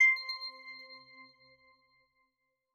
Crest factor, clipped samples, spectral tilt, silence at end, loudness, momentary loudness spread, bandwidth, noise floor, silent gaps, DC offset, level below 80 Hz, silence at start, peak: 18 dB; under 0.1%; 2 dB/octave; 1.5 s; -31 LUFS; 25 LU; 13 kHz; -82 dBFS; none; under 0.1%; under -90 dBFS; 0 s; -18 dBFS